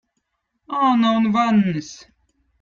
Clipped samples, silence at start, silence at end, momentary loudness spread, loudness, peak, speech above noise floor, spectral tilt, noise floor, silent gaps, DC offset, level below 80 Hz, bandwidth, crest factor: under 0.1%; 0.7 s; 0.65 s; 12 LU; -19 LUFS; -6 dBFS; 56 dB; -6.5 dB/octave; -74 dBFS; none; under 0.1%; -60 dBFS; 7.2 kHz; 14 dB